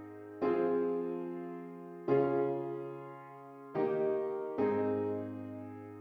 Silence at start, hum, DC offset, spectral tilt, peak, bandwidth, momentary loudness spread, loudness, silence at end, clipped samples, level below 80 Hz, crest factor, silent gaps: 0 s; none; under 0.1%; -9.5 dB/octave; -18 dBFS; 5 kHz; 16 LU; -35 LUFS; 0 s; under 0.1%; -78 dBFS; 16 dB; none